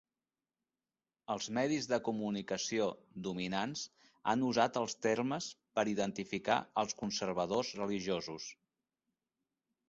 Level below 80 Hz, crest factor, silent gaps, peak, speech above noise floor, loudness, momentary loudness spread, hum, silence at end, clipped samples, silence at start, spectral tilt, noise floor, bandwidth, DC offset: -72 dBFS; 22 dB; none; -14 dBFS; over 54 dB; -36 LUFS; 9 LU; none; 1.35 s; under 0.1%; 1.3 s; -3.5 dB/octave; under -90 dBFS; 8 kHz; under 0.1%